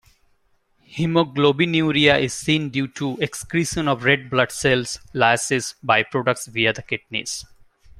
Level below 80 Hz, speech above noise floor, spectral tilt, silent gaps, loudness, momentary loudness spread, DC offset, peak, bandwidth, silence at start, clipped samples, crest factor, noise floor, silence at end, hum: -52 dBFS; 42 dB; -4 dB/octave; none; -20 LUFS; 10 LU; under 0.1%; -2 dBFS; 15.5 kHz; 0.9 s; under 0.1%; 20 dB; -63 dBFS; 0.55 s; none